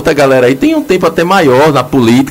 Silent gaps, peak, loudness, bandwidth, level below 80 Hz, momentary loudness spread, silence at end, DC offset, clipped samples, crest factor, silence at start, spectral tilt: none; 0 dBFS; -8 LUFS; 16.5 kHz; -38 dBFS; 3 LU; 0 s; under 0.1%; under 0.1%; 8 dB; 0 s; -6 dB/octave